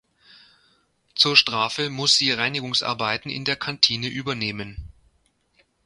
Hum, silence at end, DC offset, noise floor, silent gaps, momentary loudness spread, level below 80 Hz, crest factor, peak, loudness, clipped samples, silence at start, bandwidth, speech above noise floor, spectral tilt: none; 0.95 s; under 0.1%; -66 dBFS; none; 13 LU; -52 dBFS; 24 dB; 0 dBFS; -20 LUFS; under 0.1%; 1.15 s; 11.5 kHz; 43 dB; -2.5 dB/octave